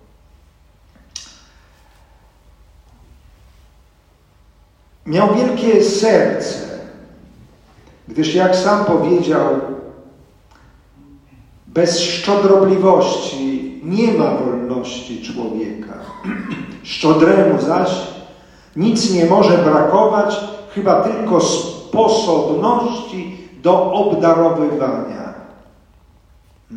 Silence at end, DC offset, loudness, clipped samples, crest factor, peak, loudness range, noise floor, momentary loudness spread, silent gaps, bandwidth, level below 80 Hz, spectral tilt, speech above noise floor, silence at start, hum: 0 s; under 0.1%; -15 LUFS; under 0.1%; 16 dB; 0 dBFS; 6 LU; -52 dBFS; 17 LU; none; 11 kHz; -50 dBFS; -5.5 dB/octave; 38 dB; 1.15 s; none